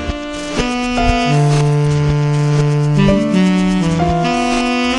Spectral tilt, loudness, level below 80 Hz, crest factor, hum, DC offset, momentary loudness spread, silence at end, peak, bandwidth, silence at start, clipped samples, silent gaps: -6.5 dB/octave; -14 LUFS; -28 dBFS; 12 dB; none; under 0.1%; 5 LU; 0 s; -2 dBFS; 11 kHz; 0 s; under 0.1%; none